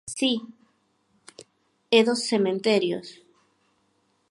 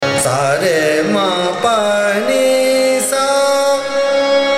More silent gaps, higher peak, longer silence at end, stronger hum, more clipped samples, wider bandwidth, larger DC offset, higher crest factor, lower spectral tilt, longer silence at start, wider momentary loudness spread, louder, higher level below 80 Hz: neither; about the same, -4 dBFS vs -2 dBFS; first, 1.2 s vs 0 s; neither; neither; second, 11.5 kHz vs 16 kHz; neither; first, 24 dB vs 12 dB; about the same, -4 dB/octave vs -3 dB/octave; about the same, 0.05 s vs 0 s; first, 11 LU vs 2 LU; second, -23 LUFS vs -14 LUFS; second, -74 dBFS vs -56 dBFS